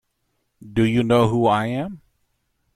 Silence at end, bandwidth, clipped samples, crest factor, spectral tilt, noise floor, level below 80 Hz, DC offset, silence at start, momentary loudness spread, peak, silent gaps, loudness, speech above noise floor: 0.8 s; 13 kHz; under 0.1%; 16 dB; -7.5 dB/octave; -72 dBFS; -48 dBFS; under 0.1%; 0.6 s; 11 LU; -6 dBFS; none; -20 LUFS; 53 dB